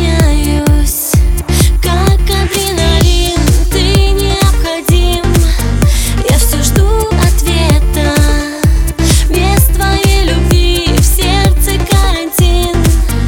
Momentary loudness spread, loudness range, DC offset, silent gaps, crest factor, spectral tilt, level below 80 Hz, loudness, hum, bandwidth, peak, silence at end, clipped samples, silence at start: 2 LU; 1 LU; under 0.1%; none; 8 dB; -4.5 dB/octave; -12 dBFS; -11 LUFS; none; 19.5 kHz; 0 dBFS; 0 s; under 0.1%; 0 s